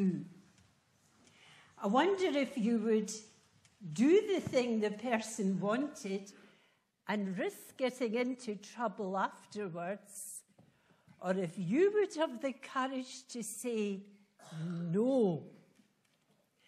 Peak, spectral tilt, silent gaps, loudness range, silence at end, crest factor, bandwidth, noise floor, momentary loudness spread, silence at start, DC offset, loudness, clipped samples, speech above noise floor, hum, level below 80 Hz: -16 dBFS; -5.5 dB/octave; none; 6 LU; 1.15 s; 20 dB; 14.5 kHz; -74 dBFS; 14 LU; 0 s; under 0.1%; -35 LUFS; under 0.1%; 40 dB; none; -84 dBFS